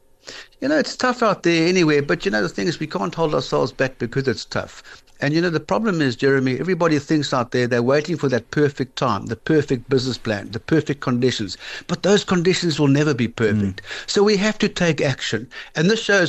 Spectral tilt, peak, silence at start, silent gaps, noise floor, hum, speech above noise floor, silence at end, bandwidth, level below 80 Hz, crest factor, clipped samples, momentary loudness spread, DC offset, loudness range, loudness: -5.5 dB/octave; -6 dBFS; 0.25 s; none; -40 dBFS; none; 21 dB; 0 s; 8.6 kHz; -48 dBFS; 14 dB; under 0.1%; 8 LU; under 0.1%; 3 LU; -20 LUFS